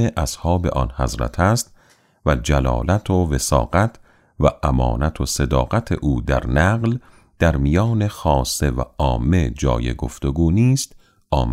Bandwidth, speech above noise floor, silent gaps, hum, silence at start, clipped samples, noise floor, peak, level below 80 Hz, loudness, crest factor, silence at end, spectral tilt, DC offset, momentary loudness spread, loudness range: 16 kHz; 37 dB; none; none; 0 s; under 0.1%; -55 dBFS; -2 dBFS; -26 dBFS; -20 LUFS; 16 dB; 0 s; -6 dB/octave; under 0.1%; 6 LU; 1 LU